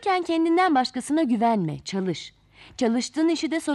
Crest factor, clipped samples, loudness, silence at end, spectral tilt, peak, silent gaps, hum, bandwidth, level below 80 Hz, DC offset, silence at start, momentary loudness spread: 14 dB; under 0.1%; -24 LUFS; 0 s; -5 dB/octave; -10 dBFS; none; none; 12 kHz; -62 dBFS; under 0.1%; 0 s; 10 LU